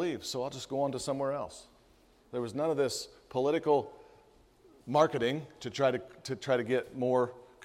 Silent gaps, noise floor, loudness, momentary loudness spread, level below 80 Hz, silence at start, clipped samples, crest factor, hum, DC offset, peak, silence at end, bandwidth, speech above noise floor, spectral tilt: none; -63 dBFS; -32 LUFS; 12 LU; -68 dBFS; 0 s; under 0.1%; 22 dB; none; under 0.1%; -10 dBFS; 0 s; 15.5 kHz; 32 dB; -5 dB/octave